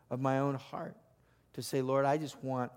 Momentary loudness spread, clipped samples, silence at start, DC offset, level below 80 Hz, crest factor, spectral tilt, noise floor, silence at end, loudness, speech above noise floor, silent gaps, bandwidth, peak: 13 LU; under 0.1%; 0.1 s; under 0.1%; -76 dBFS; 18 dB; -6.5 dB/octave; -68 dBFS; 0 s; -34 LUFS; 34 dB; none; 16.5 kHz; -16 dBFS